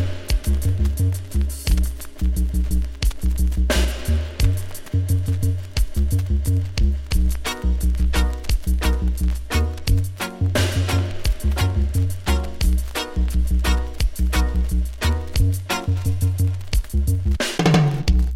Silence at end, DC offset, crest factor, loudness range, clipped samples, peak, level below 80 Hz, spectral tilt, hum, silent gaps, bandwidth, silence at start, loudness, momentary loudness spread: 0 s; under 0.1%; 16 dB; 1 LU; under 0.1%; -2 dBFS; -22 dBFS; -5.5 dB/octave; none; none; 15.5 kHz; 0 s; -22 LUFS; 4 LU